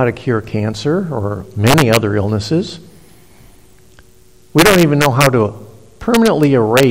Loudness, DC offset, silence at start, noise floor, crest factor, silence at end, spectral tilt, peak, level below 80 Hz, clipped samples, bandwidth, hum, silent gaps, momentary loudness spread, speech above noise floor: -13 LUFS; under 0.1%; 0 s; -48 dBFS; 14 dB; 0 s; -5.5 dB/octave; 0 dBFS; -40 dBFS; under 0.1%; 17 kHz; none; none; 10 LU; 35 dB